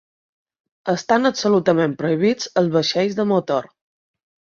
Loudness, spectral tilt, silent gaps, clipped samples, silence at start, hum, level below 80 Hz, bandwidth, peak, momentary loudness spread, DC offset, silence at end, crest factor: -19 LUFS; -5.5 dB/octave; none; under 0.1%; 0.85 s; none; -64 dBFS; 7.6 kHz; -2 dBFS; 7 LU; under 0.1%; 0.9 s; 18 dB